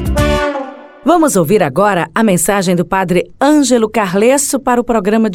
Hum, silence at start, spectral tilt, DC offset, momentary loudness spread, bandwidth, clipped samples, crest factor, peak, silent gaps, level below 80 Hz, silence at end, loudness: none; 0 s; -5 dB/octave; under 0.1%; 5 LU; 18 kHz; under 0.1%; 12 dB; 0 dBFS; none; -28 dBFS; 0 s; -12 LUFS